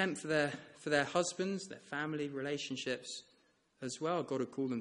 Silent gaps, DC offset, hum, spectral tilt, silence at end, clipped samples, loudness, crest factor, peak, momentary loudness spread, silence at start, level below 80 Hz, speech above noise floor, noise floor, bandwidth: none; under 0.1%; none; -4 dB/octave; 0 s; under 0.1%; -37 LUFS; 22 dB; -16 dBFS; 11 LU; 0 s; -76 dBFS; 35 dB; -72 dBFS; 11 kHz